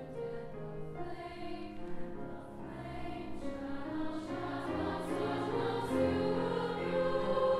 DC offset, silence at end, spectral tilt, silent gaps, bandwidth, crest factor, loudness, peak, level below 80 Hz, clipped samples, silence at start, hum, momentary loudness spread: under 0.1%; 0 s; -7 dB/octave; none; 13 kHz; 16 dB; -38 LUFS; -20 dBFS; -54 dBFS; under 0.1%; 0 s; none; 12 LU